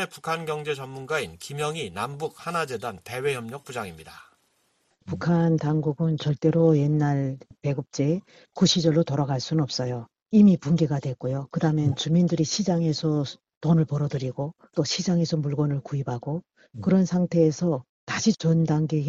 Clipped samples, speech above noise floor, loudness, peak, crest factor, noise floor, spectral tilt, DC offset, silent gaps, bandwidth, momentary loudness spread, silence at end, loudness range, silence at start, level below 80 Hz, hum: under 0.1%; 45 dB; -25 LUFS; -8 dBFS; 16 dB; -69 dBFS; -6 dB/octave; under 0.1%; 13.57-13.61 s, 17.89-18.07 s; 12.5 kHz; 12 LU; 0 s; 7 LU; 0 s; -58 dBFS; none